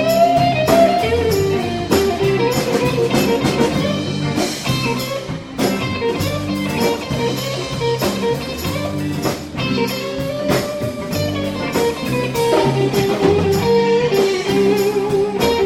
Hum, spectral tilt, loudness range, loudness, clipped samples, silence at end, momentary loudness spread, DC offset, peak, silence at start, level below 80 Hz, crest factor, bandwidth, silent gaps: none; -5 dB/octave; 5 LU; -17 LUFS; under 0.1%; 0 s; 7 LU; under 0.1%; 0 dBFS; 0 s; -40 dBFS; 16 dB; 16.5 kHz; none